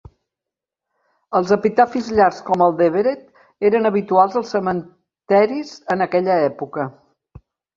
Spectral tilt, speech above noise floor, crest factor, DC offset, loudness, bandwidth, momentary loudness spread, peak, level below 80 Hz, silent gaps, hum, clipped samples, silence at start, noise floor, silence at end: -7 dB/octave; 69 dB; 18 dB; under 0.1%; -18 LUFS; 7.4 kHz; 10 LU; 0 dBFS; -56 dBFS; none; none; under 0.1%; 1.3 s; -86 dBFS; 0.85 s